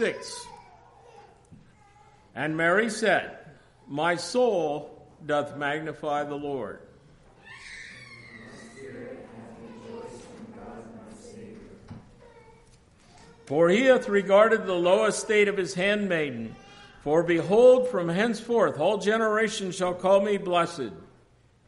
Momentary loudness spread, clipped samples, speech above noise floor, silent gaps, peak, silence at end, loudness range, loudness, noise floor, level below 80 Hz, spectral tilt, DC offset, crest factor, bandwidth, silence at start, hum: 24 LU; under 0.1%; 36 dB; none; -8 dBFS; 0.65 s; 20 LU; -24 LUFS; -60 dBFS; -62 dBFS; -4.5 dB/octave; under 0.1%; 20 dB; 11.5 kHz; 0 s; none